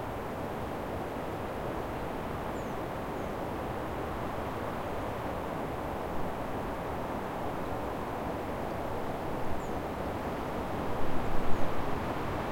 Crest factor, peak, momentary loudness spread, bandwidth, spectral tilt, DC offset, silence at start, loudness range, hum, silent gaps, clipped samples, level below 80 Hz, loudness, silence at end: 20 dB; -12 dBFS; 2 LU; 16.5 kHz; -6.5 dB/octave; 0.2%; 0 s; 1 LU; none; none; under 0.1%; -44 dBFS; -36 LUFS; 0 s